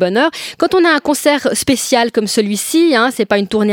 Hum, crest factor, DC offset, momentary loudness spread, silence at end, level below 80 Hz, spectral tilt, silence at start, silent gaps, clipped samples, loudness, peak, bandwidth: none; 14 dB; under 0.1%; 4 LU; 0 s; -52 dBFS; -3.5 dB/octave; 0 s; none; under 0.1%; -13 LUFS; 0 dBFS; 18.5 kHz